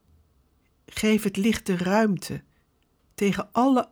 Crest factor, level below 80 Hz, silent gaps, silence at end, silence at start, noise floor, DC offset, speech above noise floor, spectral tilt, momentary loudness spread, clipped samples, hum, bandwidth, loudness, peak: 16 dB; -56 dBFS; none; 0.05 s; 0.95 s; -66 dBFS; under 0.1%; 43 dB; -5.5 dB/octave; 14 LU; under 0.1%; none; over 20 kHz; -24 LUFS; -10 dBFS